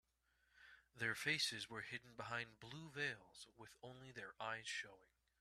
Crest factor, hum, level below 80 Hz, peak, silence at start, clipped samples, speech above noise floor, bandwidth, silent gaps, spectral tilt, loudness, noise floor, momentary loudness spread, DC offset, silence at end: 22 dB; none; -82 dBFS; -28 dBFS; 0.55 s; under 0.1%; 33 dB; 13.5 kHz; none; -2.5 dB/octave; -46 LUFS; -82 dBFS; 19 LU; under 0.1%; 0.35 s